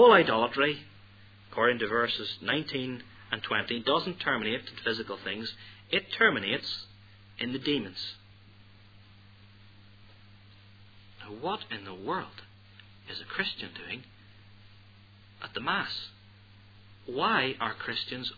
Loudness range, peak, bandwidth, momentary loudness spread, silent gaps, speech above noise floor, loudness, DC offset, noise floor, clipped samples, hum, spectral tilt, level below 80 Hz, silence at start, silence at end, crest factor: 11 LU; -6 dBFS; 5 kHz; 16 LU; none; 25 dB; -30 LUFS; under 0.1%; -55 dBFS; under 0.1%; none; -6 dB/octave; -66 dBFS; 0 s; 0 s; 26 dB